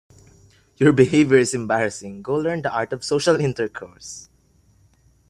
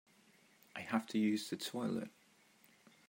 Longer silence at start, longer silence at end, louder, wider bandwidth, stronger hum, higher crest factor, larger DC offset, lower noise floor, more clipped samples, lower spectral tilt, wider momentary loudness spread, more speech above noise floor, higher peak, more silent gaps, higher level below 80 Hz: about the same, 0.8 s vs 0.75 s; about the same, 1.1 s vs 1 s; first, -20 LUFS vs -39 LUFS; second, 11 kHz vs 16 kHz; neither; about the same, 20 dB vs 22 dB; neither; second, -58 dBFS vs -69 dBFS; neither; about the same, -5.5 dB/octave vs -5 dB/octave; first, 20 LU vs 15 LU; first, 38 dB vs 31 dB; first, -2 dBFS vs -20 dBFS; neither; first, -56 dBFS vs -86 dBFS